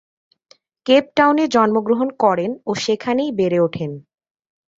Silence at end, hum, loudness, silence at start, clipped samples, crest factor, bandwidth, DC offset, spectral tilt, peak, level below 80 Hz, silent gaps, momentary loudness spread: 0.8 s; none; -18 LUFS; 0.85 s; under 0.1%; 18 dB; 7.8 kHz; under 0.1%; -5.5 dB/octave; -2 dBFS; -60 dBFS; none; 11 LU